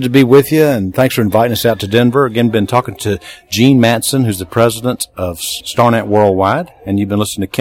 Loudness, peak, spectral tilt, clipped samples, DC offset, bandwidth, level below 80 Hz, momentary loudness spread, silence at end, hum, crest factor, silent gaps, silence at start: -13 LUFS; 0 dBFS; -5.5 dB/octave; 0.4%; under 0.1%; 17 kHz; -46 dBFS; 10 LU; 0 s; none; 12 dB; none; 0 s